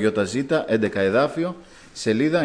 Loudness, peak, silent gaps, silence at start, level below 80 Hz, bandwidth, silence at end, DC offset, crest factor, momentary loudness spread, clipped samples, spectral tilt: -22 LUFS; -6 dBFS; none; 0 s; -58 dBFS; 10.5 kHz; 0 s; under 0.1%; 14 dB; 9 LU; under 0.1%; -5.5 dB/octave